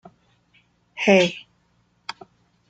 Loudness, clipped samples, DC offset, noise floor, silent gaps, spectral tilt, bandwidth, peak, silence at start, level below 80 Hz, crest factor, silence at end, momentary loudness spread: -19 LUFS; under 0.1%; under 0.1%; -64 dBFS; none; -5 dB/octave; 9.2 kHz; -2 dBFS; 0.95 s; -68 dBFS; 24 dB; 1.3 s; 23 LU